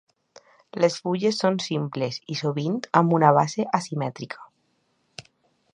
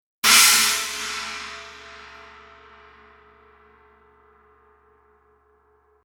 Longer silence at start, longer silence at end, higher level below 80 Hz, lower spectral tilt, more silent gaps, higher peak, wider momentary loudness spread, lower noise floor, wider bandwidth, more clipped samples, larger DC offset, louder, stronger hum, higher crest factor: first, 0.75 s vs 0.25 s; second, 0.55 s vs 4.05 s; second, -72 dBFS vs -58 dBFS; first, -6 dB/octave vs 2.5 dB/octave; neither; about the same, -2 dBFS vs 0 dBFS; second, 22 LU vs 29 LU; first, -70 dBFS vs -61 dBFS; second, 10.5 kHz vs 18 kHz; neither; neither; second, -23 LUFS vs -16 LUFS; neither; about the same, 24 dB vs 26 dB